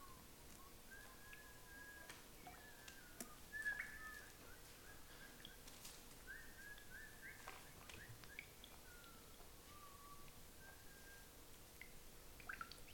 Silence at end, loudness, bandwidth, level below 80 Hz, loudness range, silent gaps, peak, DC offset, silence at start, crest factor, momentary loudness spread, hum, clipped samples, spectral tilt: 0 s; -56 LUFS; 17.5 kHz; -66 dBFS; 7 LU; none; -30 dBFS; under 0.1%; 0 s; 26 dB; 8 LU; none; under 0.1%; -2 dB/octave